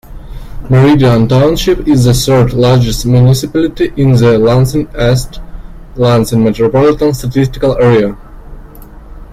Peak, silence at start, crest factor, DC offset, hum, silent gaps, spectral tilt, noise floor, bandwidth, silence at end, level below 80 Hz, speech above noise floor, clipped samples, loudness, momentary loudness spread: 0 dBFS; 0.1 s; 10 dB; under 0.1%; none; none; -6.5 dB/octave; -31 dBFS; 15 kHz; 0 s; -26 dBFS; 22 dB; under 0.1%; -9 LUFS; 6 LU